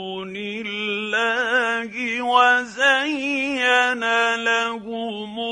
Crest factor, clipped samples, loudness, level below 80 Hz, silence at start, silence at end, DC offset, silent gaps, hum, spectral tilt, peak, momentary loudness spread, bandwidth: 18 dB; under 0.1%; -20 LUFS; -64 dBFS; 0 s; 0 s; under 0.1%; none; none; -2.5 dB/octave; -4 dBFS; 12 LU; 10.5 kHz